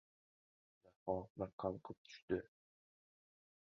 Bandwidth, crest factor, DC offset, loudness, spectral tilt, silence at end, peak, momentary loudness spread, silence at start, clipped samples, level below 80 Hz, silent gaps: 7 kHz; 24 dB; under 0.1%; -46 LUFS; -6 dB/octave; 1.15 s; -24 dBFS; 12 LU; 1.05 s; under 0.1%; -70 dBFS; 1.30-1.35 s, 1.53-1.58 s, 1.97-2.05 s, 2.22-2.28 s